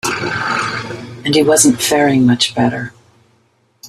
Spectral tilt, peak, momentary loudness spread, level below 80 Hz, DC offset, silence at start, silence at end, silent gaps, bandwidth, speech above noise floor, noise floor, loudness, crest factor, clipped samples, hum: -3.5 dB/octave; 0 dBFS; 14 LU; -52 dBFS; under 0.1%; 0.05 s; 0 s; none; 15 kHz; 45 dB; -57 dBFS; -13 LUFS; 16 dB; under 0.1%; none